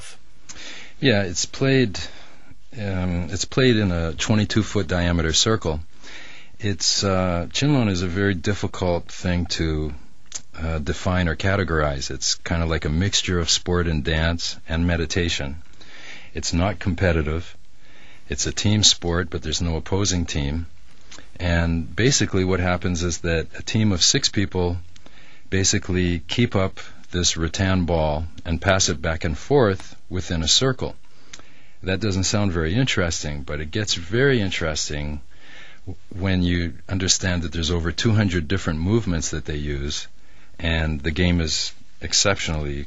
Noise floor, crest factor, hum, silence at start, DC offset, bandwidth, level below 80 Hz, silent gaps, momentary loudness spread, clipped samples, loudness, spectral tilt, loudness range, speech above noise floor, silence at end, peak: -51 dBFS; 22 dB; none; 0 s; 3%; 8 kHz; -34 dBFS; none; 14 LU; under 0.1%; -22 LUFS; -4 dB/octave; 3 LU; 29 dB; 0 s; 0 dBFS